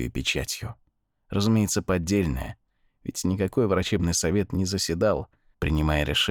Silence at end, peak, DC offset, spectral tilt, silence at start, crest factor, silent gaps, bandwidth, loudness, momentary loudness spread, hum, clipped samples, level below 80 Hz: 0 s; -10 dBFS; under 0.1%; -4.5 dB/octave; 0 s; 16 dB; none; 20 kHz; -25 LUFS; 11 LU; none; under 0.1%; -40 dBFS